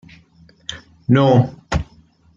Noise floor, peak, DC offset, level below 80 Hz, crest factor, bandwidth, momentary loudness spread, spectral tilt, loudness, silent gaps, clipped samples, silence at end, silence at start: -51 dBFS; -2 dBFS; under 0.1%; -38 dBFS; 16 dB; 7.6 kHz; 20 LU; -7.5 dB/octave; -17 LUFS; none; under 0.1%; 0.55 s; 0.7 s